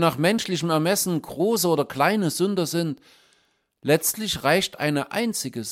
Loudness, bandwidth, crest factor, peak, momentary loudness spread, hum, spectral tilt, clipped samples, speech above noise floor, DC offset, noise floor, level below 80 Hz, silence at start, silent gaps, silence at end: -23 LUFS; 16.5 kHz; 18 dB; -6 dBFS; 5 LU; none; -4 dB/octave; under 0.1%; 43 dB; under 0.1%; -66 dBFS; -60 dBFS; 0 s; none; 0 s